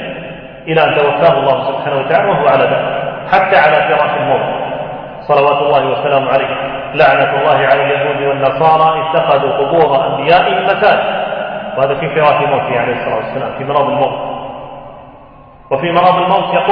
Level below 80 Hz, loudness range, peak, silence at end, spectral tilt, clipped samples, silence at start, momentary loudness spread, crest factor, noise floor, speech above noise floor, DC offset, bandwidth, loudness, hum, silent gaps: -46 dBFS; 4 LU; 0 dBFS; 0 s; -8 dB/octave; under 0.1%; 0 s; 10 LU; 12 dB; -38 dBFS; 27 dB; under 0.1%; 5.4 kHz; -12 LUFS; none; none